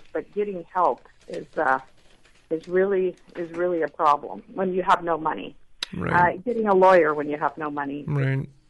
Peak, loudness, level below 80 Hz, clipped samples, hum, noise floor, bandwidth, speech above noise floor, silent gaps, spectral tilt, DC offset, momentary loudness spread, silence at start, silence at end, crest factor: -6 dBFS; -23 LUFS; -56 dBFS; under 0.1%; none; -54 dBFS; 11.5 kHz; 31 dB; none; -7 dB/octave; under 0.1%; 15 LU; 0.05 s; 0.2 s; 18 dB